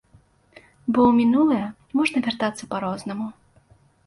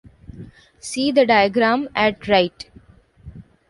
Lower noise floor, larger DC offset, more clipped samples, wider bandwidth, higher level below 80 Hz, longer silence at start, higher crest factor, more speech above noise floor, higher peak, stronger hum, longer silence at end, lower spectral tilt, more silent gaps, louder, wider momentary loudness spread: first, -57 dBFS vs -49 dBFS; neither; neither; about the same, 11.5 kHz vs 11.5 kHz; second, -58 dBFS vs -50 dBFS; first, 0.85 s vs 0.3 s; about the same, 18 dB vs 18 dB; first, 36 dB vs 31 dB; second, -6 dBFS vs -2 dBFS; neither; first, 0.75 s vs 0.3 s; about the same, -5.5 dB/octave vs -4.5 dB/octave; neither; second, -22 LUFS vs -18 LUFS; second, 14 LU vs 23 LU